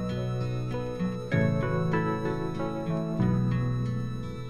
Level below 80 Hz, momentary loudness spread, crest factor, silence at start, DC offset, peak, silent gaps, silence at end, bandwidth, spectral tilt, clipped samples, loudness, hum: -46 dBFS; 6 LU; 16 dB; 0 s; under 0.1%; -14 dBFS; none; 0 s; 9.8 kHz; -8.5 dB/octave; under 0.1%; -29 LUFS; none